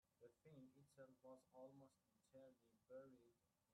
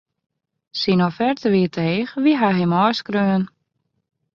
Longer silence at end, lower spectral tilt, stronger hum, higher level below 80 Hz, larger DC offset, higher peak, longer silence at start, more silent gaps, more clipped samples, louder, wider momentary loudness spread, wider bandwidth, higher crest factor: second, 0 s vs 0.9 s; about the same, -6.5 dB/octave vs -7.5 dB/octave; neither; second, under -90 dBFS vs -60 dBFS; neither; second, -52 dBFS vs -4 dBFS; second, 0.05 s vs 0.75 s; neither; neither; second, -67 LUFS vs -19 LUFS; about the same, 5 LU vs 6 LU; first, 10 kHz vs 6.8 kHz; about the same, 16 dB vs 16 dB